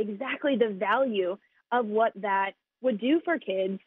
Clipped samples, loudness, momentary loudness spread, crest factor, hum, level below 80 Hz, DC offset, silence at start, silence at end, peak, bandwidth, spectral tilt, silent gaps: under 0.1%; -28 LUFS; 6 LU; 16 dB; none; -78 dBFS; under 0.1%; 0 s; 0.1 s; -10 dBFS; 4 kHz; -3.5 dB/octave; none